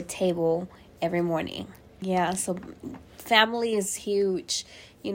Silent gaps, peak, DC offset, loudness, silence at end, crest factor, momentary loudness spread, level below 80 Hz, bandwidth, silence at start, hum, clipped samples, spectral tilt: none; -4 dBFS; under 0.1%; -26 LUFS; 0 s; 24 dB; 20 LU; -60 dBFS; 16.5 kHz; 0 s; none; under 0.1%; -3.5 dB/octave